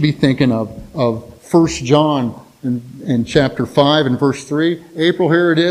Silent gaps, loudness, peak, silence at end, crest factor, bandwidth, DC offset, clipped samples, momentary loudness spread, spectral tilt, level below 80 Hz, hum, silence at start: none; -16 LUFS; 0 dBFS; 0 s; 16 dB; 13 kHz; under 0.1%; under 0.1%; 10 LU; -6 dB/octave; -44 dBFS; none; 0 s